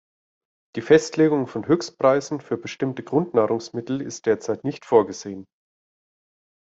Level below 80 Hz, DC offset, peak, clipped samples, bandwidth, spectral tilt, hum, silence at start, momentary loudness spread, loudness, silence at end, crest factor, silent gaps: -64 dBFS; under 0.1%; -2 dBFS; under 0.1%; 8 kHz; -6 dB/octave; none; 0.75 s; 12 LU; -22 LUFS; 1.35 s; 20 dB; none